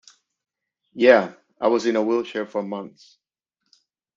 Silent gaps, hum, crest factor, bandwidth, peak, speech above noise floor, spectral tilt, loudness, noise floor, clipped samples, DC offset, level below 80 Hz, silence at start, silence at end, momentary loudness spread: none; none; 22 dB; 7.6 kHz; -2 dBFS; 58 dB; -5 dB/octave; -21 LUFS; -78 dBFS; under 0.1%; under 0.1%; -72 dBFS; 0.95 s; 1.3 s; 18 LU